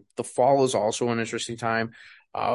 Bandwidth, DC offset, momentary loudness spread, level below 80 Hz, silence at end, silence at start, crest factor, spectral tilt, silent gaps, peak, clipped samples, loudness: 11.5 kHz; under 0.1%; 11 LU; -64 dBFS; 0 s; 0.2 s; 16 dB; -4.5 dB/octave; none; -8 dBFS; under 0.1%; -25 LUFS